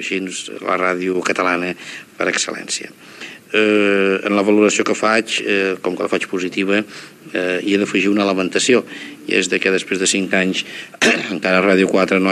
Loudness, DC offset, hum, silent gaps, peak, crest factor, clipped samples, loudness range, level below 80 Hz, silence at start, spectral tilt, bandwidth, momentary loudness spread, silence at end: -17 LUFS; under 0.1%; none; none; 0 dBFS; 18 dB; under 0.1%; 3 LU; -70 dBFS; 0 s; -3.5 dB/octave; 13.5 kHz; 12 LU; 0 s